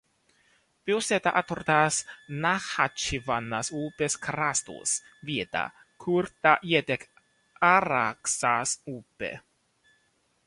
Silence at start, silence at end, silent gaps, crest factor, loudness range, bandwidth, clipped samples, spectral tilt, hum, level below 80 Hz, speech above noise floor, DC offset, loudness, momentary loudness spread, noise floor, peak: 0.85 s; 1.1 s; none; 24 dB; 4 LU; 11.5 kHz; under 0.1%; -3 dB/octave; none; -58 dBFS; 43 dB; under 0.1%; -27 LUFS; 14 LU; -70 dBFS; -4 dBFS